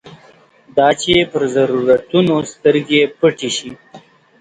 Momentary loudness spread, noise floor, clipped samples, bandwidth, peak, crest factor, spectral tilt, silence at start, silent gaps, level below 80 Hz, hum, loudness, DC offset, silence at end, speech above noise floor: 8 LU; -47 dBFS; under 0.1%; 9.6 kHz; 0 dBFS; 16 dB; -4.5 dB/octave; 0.05 s; none; -50 dBFS; none; -15 LUFS; under 0.1%; 0.45 s; 33 dB